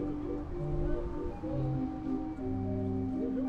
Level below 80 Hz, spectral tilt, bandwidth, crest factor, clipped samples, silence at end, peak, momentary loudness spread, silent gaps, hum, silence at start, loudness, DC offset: -42 dBFS; -10.5 dB/octave; 6.6 kHz; 14 dB; under 0.1%; 0 s; -20 dBFS; 4 LU; none; none; 0 s; -36 LUFS; under 0.1%